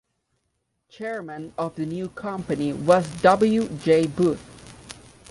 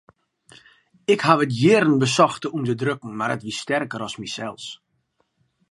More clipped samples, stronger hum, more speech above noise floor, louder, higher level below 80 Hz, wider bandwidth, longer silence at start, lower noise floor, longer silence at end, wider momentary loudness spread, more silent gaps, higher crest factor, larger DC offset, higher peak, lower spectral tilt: neither; neither; first, 53 dB vs 49 dB; about the same, -23 LUFS vs -21 LUFS; first, -54 dBFS vs -66 dBFS; about the same, 11.5 kHz vs 11.5 kHz; about the same, 1 s vs 1.1 s; first, -75 dBFS vs -70 dBFS; second, 0 s vs 0.95 s; first, 17 LU vs 14 LU; neither; about the same, 20 dB vs 22 dB; neither; about the same, -4 dBFS vs -2 dBFS; first, -6.5 dB/octave vs -5 dB/octave